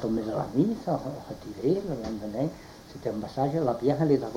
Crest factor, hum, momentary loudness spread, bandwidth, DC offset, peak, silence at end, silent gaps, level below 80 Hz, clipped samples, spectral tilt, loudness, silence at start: 18 dB; none; 12 LU; 16.5 kHz; under 0.1%; -12 dBFS; 0 s; none; -54 dBFS; under 0.1%; -8 dB/octave; -29 LUFS; 0 s